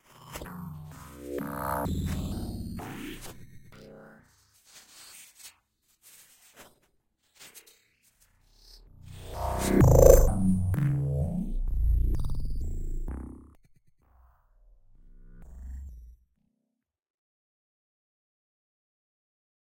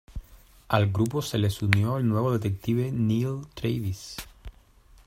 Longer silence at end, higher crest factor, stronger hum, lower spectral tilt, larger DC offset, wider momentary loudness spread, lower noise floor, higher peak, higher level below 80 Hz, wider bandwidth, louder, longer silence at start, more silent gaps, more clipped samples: first, 3.55 s vs 0.55 s; about the same, 28 dB vs 26 dB; neither; about the same, -6.5 dB/octave vs -6.5 dB/octave; neither; first, 28 LU vs 15 LU; first, -83 dBFS vs -55 dBFS; about the same, -2 dBFS vs 0 dBFS; first, -34 dBFS vs -48 dBFS; about the same, 16.5 kHz vs 16 kHz; about the same, -27 LUFS vs -27 LUFS; first, 0.25 s vs 0.1 s; neither; neither